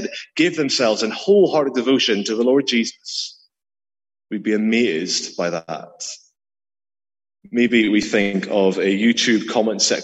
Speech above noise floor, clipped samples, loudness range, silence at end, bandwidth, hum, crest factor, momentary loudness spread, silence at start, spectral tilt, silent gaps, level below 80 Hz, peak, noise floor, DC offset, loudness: over 71 dB; under 0.1%; 6 LU; 0 s; 8.6 kHz; none; 18 dB; 12 LU; 0 s; -3.5 dB/octave; none; -64 dBFS; -2 dBFS; under -90 dBFS; under 0.1%; -18 LUFS